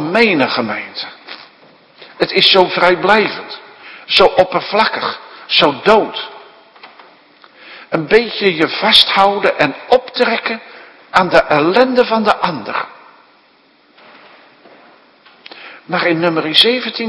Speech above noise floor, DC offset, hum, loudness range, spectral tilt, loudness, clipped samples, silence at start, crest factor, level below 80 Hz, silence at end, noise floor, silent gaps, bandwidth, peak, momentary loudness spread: 38 dB; under 0.1%; none; 7 LU; -4.5 dB/octave; -12 LUFS; 0.3%; 0 s; 16 dB; -50 dBFS; 0 s; -51 dBFS; none; 11 kHz; 0 dBFS; 19 LU